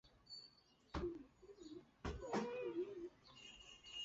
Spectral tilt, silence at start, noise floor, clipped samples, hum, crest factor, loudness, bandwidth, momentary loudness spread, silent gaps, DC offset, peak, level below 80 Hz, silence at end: -4 dB/octave; 0.05 s; -70 dBFS; under 0.1%; none; 20 dB; -50 LUFS; 7.6 kHz; 14 LU; none; under 0.1%; -30 dBFS; -62 dBFS; 0 s